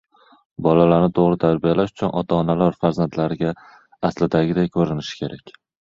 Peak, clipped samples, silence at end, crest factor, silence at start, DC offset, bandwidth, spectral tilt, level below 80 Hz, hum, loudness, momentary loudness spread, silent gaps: -2 dBFS; under 0.1%; 0.35 s; 18 dB; 0.6 s; under 0.1%; 7.4 kHz; -8 dB/octave; -48 dBFS; none; -20 LUFS; 13 LU; none